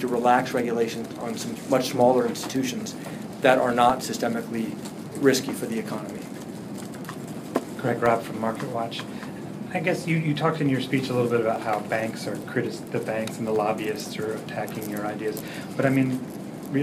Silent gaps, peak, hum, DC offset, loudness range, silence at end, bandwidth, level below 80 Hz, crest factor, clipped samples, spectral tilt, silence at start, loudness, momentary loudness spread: none; -4 dBFS; none; under 0.1%; 5 LU; 0 s; 15.5 kHz; -64 dBFS; 22 dB; under 0.1%; -5.5 dB/octave; 0 s; -26 LUFS; 14 LU